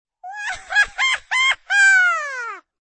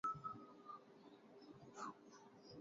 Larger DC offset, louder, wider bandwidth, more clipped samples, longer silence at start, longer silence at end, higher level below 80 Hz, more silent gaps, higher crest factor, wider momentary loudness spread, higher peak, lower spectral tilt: neither; first, -16 LUFS vs -56 LUFS; first, 8.8 kHz vs 7.4 kHz; neither; first, 0.25 s vs 0.05 s; first, 0.2 s vs 0 s; first, -54 dBFS vs -84 dBFS; neither; second, 14 dB vs 20 dB; first, 17 LU vs 13 LU; first, -6 dBFS vs -34 dBFS; second, 3 dB/octave vs -4.5 dB/octave